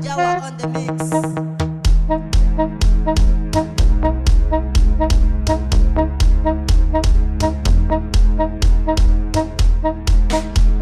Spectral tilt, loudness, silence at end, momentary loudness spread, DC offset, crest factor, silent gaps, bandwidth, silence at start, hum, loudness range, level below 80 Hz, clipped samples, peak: -6 dB/octave; -18 LUFS; 0 s; 3 LU; under 0.1%; 8 dB; none; 11.5 kHz; 0 s; none; 2 LU; -14 dBFS; under 0.1%; -6 dBFS